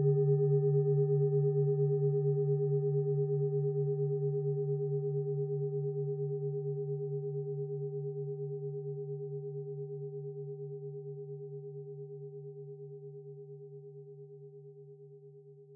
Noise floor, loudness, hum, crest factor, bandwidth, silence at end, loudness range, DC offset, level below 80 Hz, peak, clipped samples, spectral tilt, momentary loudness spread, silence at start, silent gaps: -54 dBFS; -34 LUFS; none; 14 dB; 1.9 kHz; 0 s; 17 LU; under 0.1%; under -90 dBFS; -20 dBFS; under 0.1%; -15.5 dB/octave; 21 LU; 0 s; none